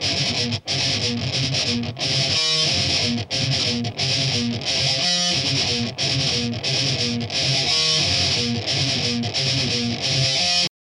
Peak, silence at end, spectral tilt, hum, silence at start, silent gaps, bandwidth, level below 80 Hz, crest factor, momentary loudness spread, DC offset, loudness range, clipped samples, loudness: -8 dBFS; 0.1 s; -3 dB/octave; none; 0 s; none; 11 kHz; -50 dBFS; 14 dB; 5 LU; under 0.1%; 1 LU; under 0.1%; -19 LUFS